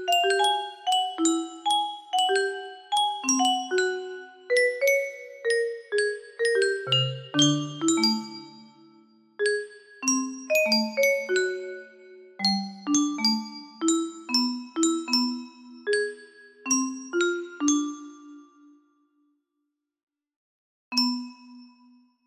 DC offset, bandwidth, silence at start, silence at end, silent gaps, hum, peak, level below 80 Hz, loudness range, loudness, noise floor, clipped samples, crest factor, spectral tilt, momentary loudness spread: under 0.1%; 15.5 kHz; 0 s; 0.6 s; 20.03-20.07 s, 20.36-20.91 s; none; -8 dBFS; -74 dBFS; 7 LU; -25 LUFS; -81 dBFS; under 0.1%; 18 dB; -2.5 dB/octave; 13 LU